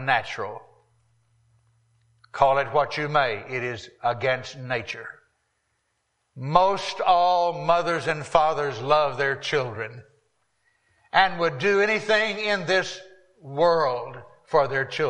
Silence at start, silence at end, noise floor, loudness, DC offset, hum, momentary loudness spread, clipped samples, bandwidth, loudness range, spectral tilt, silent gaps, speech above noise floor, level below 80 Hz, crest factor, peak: 0 s; 0 s; -74 dBFS; -23 LUFS; under 0.1%; none; 14 LU; under 0.1%; 10 kHz; 5 LU; -4.5 dB/octave; none; 51 dB; -58 dBFS; 22 dB; -4 dBFS